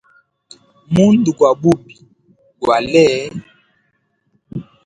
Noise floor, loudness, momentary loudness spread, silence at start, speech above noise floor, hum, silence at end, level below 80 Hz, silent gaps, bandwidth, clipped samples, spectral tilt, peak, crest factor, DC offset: -65 dBFS; -14 LUFS; 19 LU; 0.9 s; 52 dB; none; 0.25 s; -50 dBFS; none; 11 kHz; under 0.1%; -6.5 dB/octave; 0 dBFS; 18 dB; under 0.1%